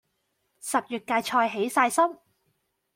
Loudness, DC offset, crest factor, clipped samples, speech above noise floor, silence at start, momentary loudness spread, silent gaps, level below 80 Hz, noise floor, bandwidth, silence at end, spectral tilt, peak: -25 LUFS; under 0.1%; 20 dB; under 0.1%; 50 dB; 0.65 s; 6 LU; none; -76 dBFS; -75 dBFS; 16.5 kHz; 0.8 s; -2.5 dB/octave; -8 dBFS